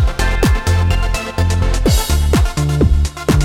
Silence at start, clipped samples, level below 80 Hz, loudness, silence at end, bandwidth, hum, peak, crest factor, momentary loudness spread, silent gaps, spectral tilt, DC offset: 0 s; under 0.1%; -16 dBFS; -16 LUFS; 0 s; 17 kHz; none; -2 dBFS; 12 dB; 3 LU; none; -5.5 dB/octave; under 0.1%